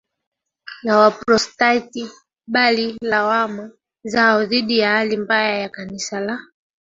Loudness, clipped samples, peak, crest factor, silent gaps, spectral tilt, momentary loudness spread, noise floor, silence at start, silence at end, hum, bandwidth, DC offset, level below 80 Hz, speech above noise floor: -18 LUFS; under 0.1%; -2 dBFS; 18 dB; none; -3.5 dB/octave; 16 LU; -41 dBFS; 0.65 s; 0.45 s; none; 7.8 kHz; under 0.1%; -60 dBFS; 23 dB